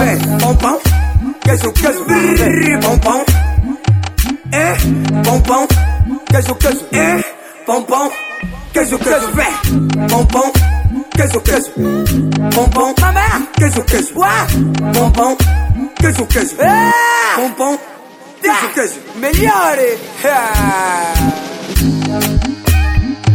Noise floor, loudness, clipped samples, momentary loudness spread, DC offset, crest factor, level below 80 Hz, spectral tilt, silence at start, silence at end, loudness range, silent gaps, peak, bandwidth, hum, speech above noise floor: -35 dBFS; -13 LUFS; under 0.1%; 6 LU; under 0.1%; 12 dB; -20 dBFS; -5 dB/octave; 0 s; 0 s; 2 LU; none; 0 dBFS; 19.5 kHz; none; 23 dB